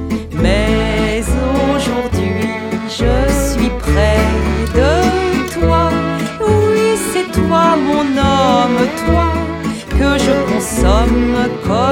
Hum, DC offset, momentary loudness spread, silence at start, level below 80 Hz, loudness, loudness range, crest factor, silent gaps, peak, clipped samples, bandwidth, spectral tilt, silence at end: none; under 0.1%; 5 LU; 0 s; -20 dBFS; -14 LUFS; 2 LU; 14 dB; none; 0 dBFS; under 0.1%; 17.5 kHz; -5.5 dB/octave; 0 s